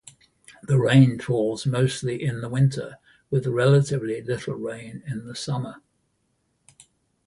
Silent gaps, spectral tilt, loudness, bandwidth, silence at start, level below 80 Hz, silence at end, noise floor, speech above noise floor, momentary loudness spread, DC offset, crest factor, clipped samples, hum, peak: none; -7 dB/octave; -23 LUFS; 11.5 kHz; 0.5 s; -58 dBFS; 1.5 s; -71 dBFS; 49 dB; 16 LU; under 0.1%; 20 dB; under 0.1%; none; -4 dBFS